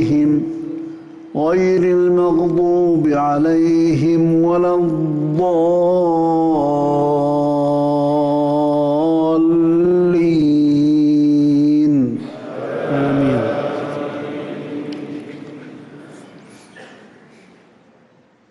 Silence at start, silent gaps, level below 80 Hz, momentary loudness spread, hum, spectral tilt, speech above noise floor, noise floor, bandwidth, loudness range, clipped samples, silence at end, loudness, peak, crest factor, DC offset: 0 s; none; -52 dBFS; 14 LU; none; -8.5 dB/octave; 38 dB; -52 dBFS; 7.4 kHz; 13 LU; under 0.1%; 1.65 s; -15 LUFS; -8 dBFS; 8 dB; under 0.1%